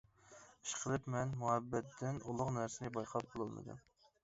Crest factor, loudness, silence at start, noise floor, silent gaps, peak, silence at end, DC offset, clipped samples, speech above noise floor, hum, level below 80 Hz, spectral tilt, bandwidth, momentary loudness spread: 22 dB; -41 LUFS; 0.25 s; -63 dBFS; none; -20 dBFS; 0.45 s; under 0.1%; under 0.1%; 22 dB; none; -68 dBFS; -6 dB/octave; 7.6 kHz; 15 LU